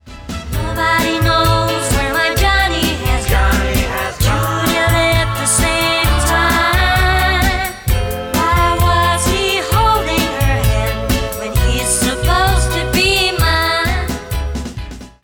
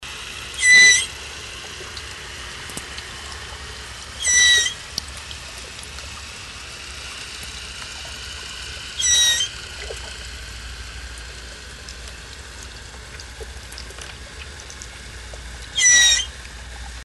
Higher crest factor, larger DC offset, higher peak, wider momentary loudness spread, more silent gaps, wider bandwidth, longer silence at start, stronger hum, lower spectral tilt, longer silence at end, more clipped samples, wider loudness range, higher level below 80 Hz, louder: second, 12 dB vs 20 dB; neither; about the same, -2 dBFS vs -4 dBFS; second, 7 LU vs 24 LU; neither; first, 17.5 kHz vs 12 kHz; about the same, 0.05 s vs 0 s; neither; first, -4 dB/octave vs 1 dB/octave; first, 0.15 s vs 0 s; neither; second, 2 LU vs 18 LU; first, -20 dBFS vs -40 dBFS; about the same, -14 LUFS vs -15 LUFS